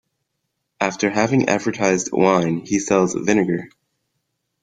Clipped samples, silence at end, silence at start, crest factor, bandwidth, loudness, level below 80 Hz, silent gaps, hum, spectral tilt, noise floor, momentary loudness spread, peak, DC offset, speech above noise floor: under 0.1%; 0.95 s; 0.8 s; 18 dB; 9.4 kHz; -19 LUFS; -56 dBFS; none; none; -5 dB/octave; -76 dBFS; 6 LU; -2 dBFS; under 0.1%; 57 dB